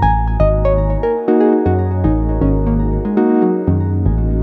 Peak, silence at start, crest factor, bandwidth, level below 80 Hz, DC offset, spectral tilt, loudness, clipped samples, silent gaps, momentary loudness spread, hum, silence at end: 0 dBFS; 0 s; 12 dB; 4.3 kHz; -20 dBFS; under 0.1%; -11.5 dB/octave; -15 LUFS; under 0.1%; none; 3 LU; none; 0 s